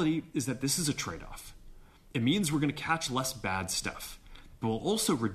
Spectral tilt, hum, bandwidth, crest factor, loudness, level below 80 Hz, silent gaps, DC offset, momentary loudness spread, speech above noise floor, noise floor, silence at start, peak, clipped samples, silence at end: -4 dB/octave; none; 14 kHz; 18 dB; -31 LUFS; -54 dBFS; none; under 0.1%; 15 LU; 20 dB; -52 dBFS; 0 s; -14 dBFS; under 0.1%; 0 s